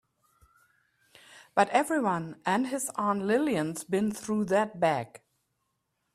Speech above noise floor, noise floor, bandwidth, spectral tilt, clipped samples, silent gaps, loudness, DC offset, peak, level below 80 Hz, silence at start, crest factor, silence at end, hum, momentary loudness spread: 51 dB; -79 dBFS; 15.5 kHz; -5 dB/octave; under 0.1%; none; -28 LUFS; under 0.1%; -8 dBFS; -70 dBFS; 1.35 s; 22 dB; 1 s; none; 6 LU